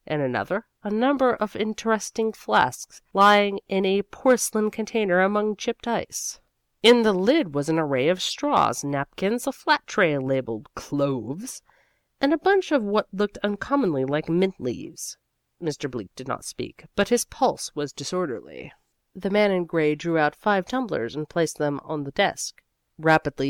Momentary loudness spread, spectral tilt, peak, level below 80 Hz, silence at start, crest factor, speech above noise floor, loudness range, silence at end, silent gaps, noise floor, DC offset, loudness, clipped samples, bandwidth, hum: 12 LU; -4.5 dB/octave; -6 dBFS; -58 dBFS; 0.1 s; 18 dB; 41 dB; 6 LU; 0 s; none; -65 dBFS; under 0.1%; -24 LUFS; under 0.1%; 18 kHz; none